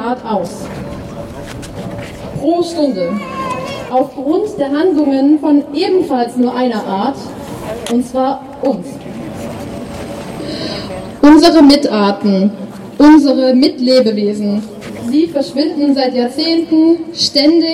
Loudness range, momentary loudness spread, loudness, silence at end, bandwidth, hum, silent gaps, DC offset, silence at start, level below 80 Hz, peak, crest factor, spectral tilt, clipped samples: 10 LU; 18 LU; -12 LUFS; 0 s; 14 kHz; none; none; under 0.1%; 0 s; -42 dBFS; 0 dBFS; 12 dB; -5.5 dB/octave; under 0.1%